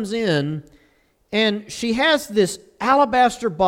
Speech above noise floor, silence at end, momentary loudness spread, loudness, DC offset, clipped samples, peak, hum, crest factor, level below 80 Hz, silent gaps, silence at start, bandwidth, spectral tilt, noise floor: 41 dB; 0 s; 9 LU; -19 LUFS; under 0.1%; under 0.1%; -4 dBFS; none; 16 dB; -54 dBFS; none; 0 s; 16.5 kHz; -4.5 dB/octave; -60 dBFS